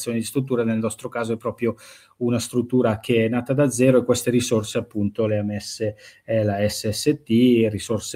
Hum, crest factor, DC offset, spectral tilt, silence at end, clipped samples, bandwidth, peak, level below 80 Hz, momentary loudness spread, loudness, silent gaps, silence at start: none; 16 dB; under 0.1%; -5.5 dB/octave; 0 s; under 0.1%; 16 kHz; -4 dBFS; -58 dBFS; 10 LU; -22 LUFS; none; 0 s